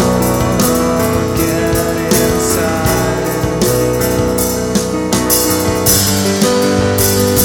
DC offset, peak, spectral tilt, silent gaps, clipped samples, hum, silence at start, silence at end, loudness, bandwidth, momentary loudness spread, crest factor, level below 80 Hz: under 0.1%; 0 dBFS; -4 dB/octave; none; under 0.1%; none; 0 s; 0 s; -13 LUFS; over 20 kHz; 4 LU; 12 dB; -28 dBFS